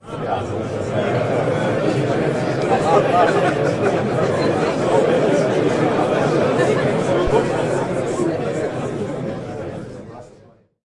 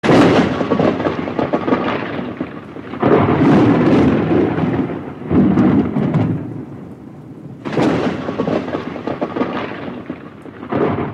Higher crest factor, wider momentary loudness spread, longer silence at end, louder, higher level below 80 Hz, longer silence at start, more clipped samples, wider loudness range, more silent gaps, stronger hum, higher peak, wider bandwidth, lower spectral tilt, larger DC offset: about the same, 16 dB vs 16 dB; second, 9 LU vs 19 LU; first, 0.6 s vs 0 s; second, -19 LUFS vs -16 LUFS; about the same, -44 dBFS vs -44 dBFS; about the same, 0.05 s vs 0.05 s; neither; second, 4 LU vs 7 LU; neither; neither; about the same, -2 dBFS vs 0 dBFS; first, 11.5 kHz vs 9.6 kHz; second, -6.5 dB/octave vs -8 dB/octave; neither